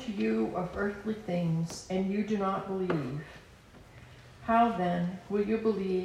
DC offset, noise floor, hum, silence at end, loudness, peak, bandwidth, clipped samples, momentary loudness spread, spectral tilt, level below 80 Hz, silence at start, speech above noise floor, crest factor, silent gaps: under 0.1%; -54 dBFS; none; 0 s; -31 LUFS; -14 dBFS; 12.5 kHz; under 0.1%; 8 LU; -7 dB/octave; -58 dBFS; 0 s; 23 dB; 16 dB; none